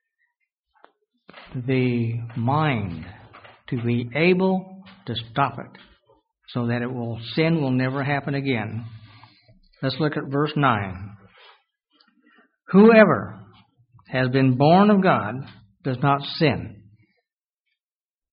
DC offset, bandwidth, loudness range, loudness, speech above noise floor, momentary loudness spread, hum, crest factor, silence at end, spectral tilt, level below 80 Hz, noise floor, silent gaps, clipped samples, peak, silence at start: under 0.1%; 5.2 kHz; 8 LU; -21 LUFS; over 69 dB; 20 LU; none; 22 dB; 1.6 s; -5.5 dB/octave; -58 dBFS; under -90 dBFS; none; under 0.1%; 0 dBFS; 1.35 s